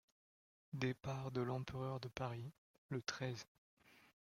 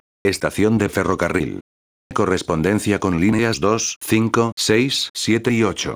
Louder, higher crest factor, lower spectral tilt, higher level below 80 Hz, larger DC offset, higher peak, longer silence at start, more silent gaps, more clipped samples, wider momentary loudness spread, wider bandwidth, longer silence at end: second, -46 LUFS vs -19 LUFS; first, 24 dB vs 18 dB; about the same, -5.5 dB/octave vs -4.5 dB/octave; second, -72 dBFS vs -48 dBFS; neither; second, -24 dBFS vs -2 dBFS; first, 0.7 s vs 0.25 s; about the same, 2.58-2.89 s, 3.48-3.77 s vs 1.61-2.10 s, 3.96-4.01 s, 4.52-4.57 s, 5.10-5.14 s; neither; first, 10 LU vs 5 LU; second, 13 kHz vs over 20 kHz; first, 0.15 s vs 0 s